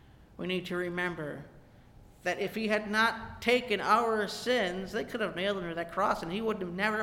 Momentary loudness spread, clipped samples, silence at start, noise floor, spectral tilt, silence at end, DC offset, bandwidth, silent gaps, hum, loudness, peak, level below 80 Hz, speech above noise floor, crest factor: 9 LU; under 0.1%; 0.1 s; -55 dBFS; -4.5 dB/octave; 0 s; under 0.1%; 17 kHz; none; none; -31 LUFS; -12 dBFS; -58 dBFS; 24 dB; 20 dB